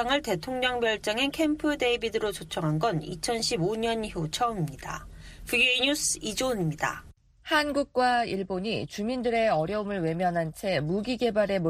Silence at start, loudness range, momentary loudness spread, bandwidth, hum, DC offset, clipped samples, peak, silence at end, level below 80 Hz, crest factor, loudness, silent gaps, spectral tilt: 0 s; 2 LU; 7 LU; 15.5 kHz; none; under 0.1%; under 0.1%; -10 dBFS; 0 s; -52 dBFS; 18 dB; -27 LUFS; none; -4 dB/octave